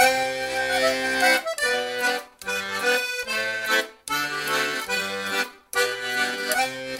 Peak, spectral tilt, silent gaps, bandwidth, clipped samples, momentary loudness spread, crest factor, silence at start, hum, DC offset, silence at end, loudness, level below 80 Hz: -6 dBFS; -1 dB/octave; none; 16 kHz; under 0.1%; 7 LU; 20 dB; 0 s; none; under 0.1%; 0 s; -24 LUFS; -60 dBFS